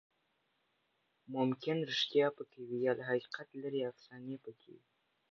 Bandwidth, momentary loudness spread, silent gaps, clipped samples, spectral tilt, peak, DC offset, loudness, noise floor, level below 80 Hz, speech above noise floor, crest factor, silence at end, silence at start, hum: 7.2 kHz; 16 LU; none; under 0.1%; -3.5 dB/octave; -20 dBFS; under 0.1%; -37 LUFS; -80 dBFS; -90 dBFS; 42 dB; 20 dB; 0.55 s; 1.3 s; none